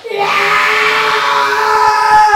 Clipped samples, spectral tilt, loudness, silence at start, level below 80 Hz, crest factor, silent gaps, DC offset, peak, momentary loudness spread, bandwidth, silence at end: under 0.1%; -1 dB/octave; -10 LUFS; 0.05 s; -48 dBFS; 10 dB; none; under 0.1%; 0 dBFS; 3 LU; 16.5 kHz; 0 s